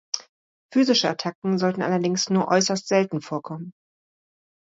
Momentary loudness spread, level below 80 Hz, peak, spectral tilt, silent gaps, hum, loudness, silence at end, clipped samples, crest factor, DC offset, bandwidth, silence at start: 12 LU; -70 dBFS; -6 dBFS; -4.5 dB/octave; 0.29-0.69 s, 1.35-1.42 s; none; -23 LUFS; 1 s; under 0.1%; 20 dB; under 0.1%; 7.8 kHz; 0.15 s